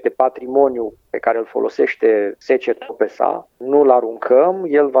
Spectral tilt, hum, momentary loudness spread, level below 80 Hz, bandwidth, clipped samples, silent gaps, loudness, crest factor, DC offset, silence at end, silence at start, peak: -6.5 dB/octave; none; 8 LU; -64 dBFS; 6.2 kHz; under 0.1%; none; -17 LUFS; 16 dB; under 0.1%; 0 s; 0.05 s; 0 dBFS